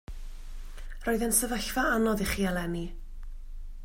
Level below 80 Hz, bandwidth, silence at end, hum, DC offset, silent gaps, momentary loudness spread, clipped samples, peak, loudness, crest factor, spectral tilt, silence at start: -38 dBFS; 16.5 kHz; 0 s; none; under 0.1%; none; 23 LU; under 0.1%; -12 dBFS; -28 LUFS; 18 dB; -3.5 dB/octave; 0.1 s